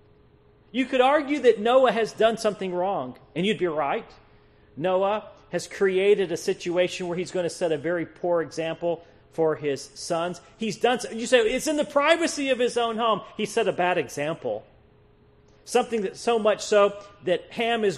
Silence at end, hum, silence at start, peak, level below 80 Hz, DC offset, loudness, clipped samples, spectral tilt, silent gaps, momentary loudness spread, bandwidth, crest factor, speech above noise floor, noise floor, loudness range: 0 s; none; 0.75 s; -6 dBFS; -62 dBFS; under 0.1%; -25 LUFS; under 0.1%; -4 dB/octave; none; 11 LU; 13.5 kHz; 18 dB; 32 dB; -57 dBFS; 5 LU